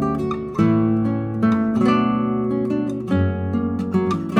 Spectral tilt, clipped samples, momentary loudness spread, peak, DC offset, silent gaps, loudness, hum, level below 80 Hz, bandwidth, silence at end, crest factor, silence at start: -8.5 dB/octave; under 0.1%; 5 LU; -4 dBFS; under 0.1%; none; -20 LUFS; none; -46 dBFS; 8.6 kHz; 0 s; 16 dB; 0 s